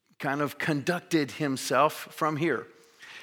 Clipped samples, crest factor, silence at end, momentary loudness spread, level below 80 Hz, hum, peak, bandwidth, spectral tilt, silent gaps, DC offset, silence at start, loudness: under 0.1%; 20 dB; 0 s; 6 LU; -78 dBFS; none; -10 dBFS; 19 kHz; -5 dB/octave; none; under 0.1%; 0.2 s; -28 LUFS